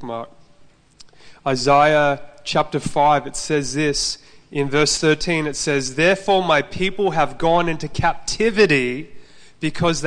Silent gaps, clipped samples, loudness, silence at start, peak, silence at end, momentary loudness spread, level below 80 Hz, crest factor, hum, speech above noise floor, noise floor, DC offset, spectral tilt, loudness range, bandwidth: none; under 0.1%; -19 LUFS; 0 s; -2 dBFS; 0 s; 12 LU; -40 dBFS; 16 dB; none; 31 dB; -50 dBFS; under 0.1%; -4 dB/octave; 2 LU; 10.5 kHz